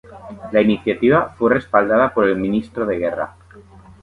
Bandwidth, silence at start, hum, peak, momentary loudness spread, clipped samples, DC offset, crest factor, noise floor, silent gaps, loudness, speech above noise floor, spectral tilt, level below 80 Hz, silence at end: 4.9 kHz; 0.1 s; none; 0 dBFS; 11 LU; under 0.1%; under 0.1%; 18 dB; -44 dBFS; none; -18 LUFS; 26 dB; -8 dB/octave; -48 dBFS; 0.4 s